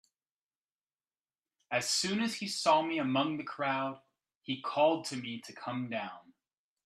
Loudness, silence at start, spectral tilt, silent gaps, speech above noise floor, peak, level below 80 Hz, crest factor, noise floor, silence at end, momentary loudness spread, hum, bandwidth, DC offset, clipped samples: -33 LUFS; 1.7 s; -3.5 dB/octave; 4.36-4.41 s; over 57 dB; -14 dBFS; -82 dBFS; 22 dB; under -90 dBFS; 0.65 s; 13 LU; none; 14 kHz; under 0.1%; under 0.1%